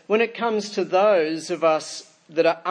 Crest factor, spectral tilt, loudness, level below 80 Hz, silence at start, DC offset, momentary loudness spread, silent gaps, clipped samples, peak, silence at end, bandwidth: 16 dB; -4 dB/octave; -22 LUFS; -82 dBFS; 0.1 s; under 0.1%; 10 LU; none; under 0.1%; -6 dBFS; 0 s; 10.5 kHz